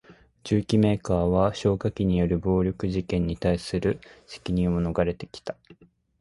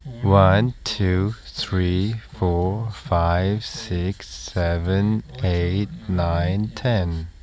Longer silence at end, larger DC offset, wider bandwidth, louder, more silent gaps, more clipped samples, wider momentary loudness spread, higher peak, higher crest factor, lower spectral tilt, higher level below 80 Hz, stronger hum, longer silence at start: first, 0.5 s vs 0.1 s; neither; first, 11.5 kHz vs 8 kHz; second, -25 LUFS vs -22 LUFS; neither; neither; first, 15 LU vs 9 LU; second, -8 dBFS vs 0 dBFS; about the same, 18 dB vs 20 dB; about the same, -7.5 dB/octave vs -7 dB/octave; second, -40 dBFS vs -32 dBFS; neither; about the same, 0.1 s vs 0.05 s